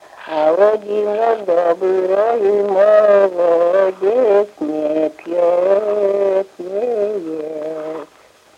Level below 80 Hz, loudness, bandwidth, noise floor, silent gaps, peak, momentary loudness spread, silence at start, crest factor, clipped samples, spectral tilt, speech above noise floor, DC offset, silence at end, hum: -66 dBFS; -16 LUFS; 8.6 kHz; -48 dBFS; none; -2 dBFS; 12 LU; 0.15 s; 14 dB; under 0.1%; -6 dB/octave; 33 dB; under 0.1%; 0.55 s; none